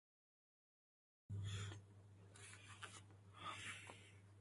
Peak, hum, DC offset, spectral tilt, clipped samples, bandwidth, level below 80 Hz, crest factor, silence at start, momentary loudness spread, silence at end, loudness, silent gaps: -36 dBFS; none; under 0.1%; -3.5 dB/octave; under 0.1%; 11.5 kHz; -72 dBFS; 20 dB; 1.3 s; 15 LU; 0 s; -54 LUFS; none